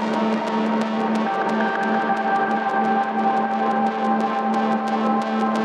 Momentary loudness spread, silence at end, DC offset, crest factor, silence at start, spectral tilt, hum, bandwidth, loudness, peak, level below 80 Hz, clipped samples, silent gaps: 1 LU; 0 s; under 0.1%; 12 dB; 0 s; -6 dB/octave; none; 9.4 kHz; -21 LUFS; -8 dBFS; -82 dBFS; under 0.1%; none